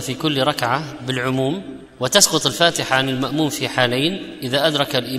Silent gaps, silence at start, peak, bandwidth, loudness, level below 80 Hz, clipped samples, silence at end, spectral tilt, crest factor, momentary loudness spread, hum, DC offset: none; 0 s; 0 dBFS; 16 kHz; -18 LUFS; -52 dBFS; under 0.1%; 0 s; -3 dB/octave; 20 dB; 10 LU; none; under 0.1%